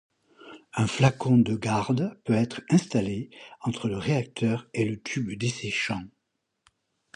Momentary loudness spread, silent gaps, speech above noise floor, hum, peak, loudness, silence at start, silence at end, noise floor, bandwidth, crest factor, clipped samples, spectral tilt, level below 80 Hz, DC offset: 10 LU; none; 53 dB; none; -8 dBFS; -27 LUFS; 0.45 s; 1.05 s; -79 dBFS; 11 kHz; 20 dB; under 0.1%; -6 dB/octave; -58 dBFS; under 0.1%